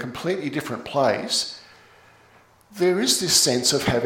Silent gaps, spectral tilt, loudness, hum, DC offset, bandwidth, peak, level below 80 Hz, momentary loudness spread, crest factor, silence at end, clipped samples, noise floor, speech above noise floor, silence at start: none; -2.5 dB/octave; -21 LUFS; none; under 0.1%; 17 kHz; -4 dBFS; -54 dBFS; 12 LU; 20 dB; 0 s; under 0.1%; -55 dBFS; 32 dB; 0 s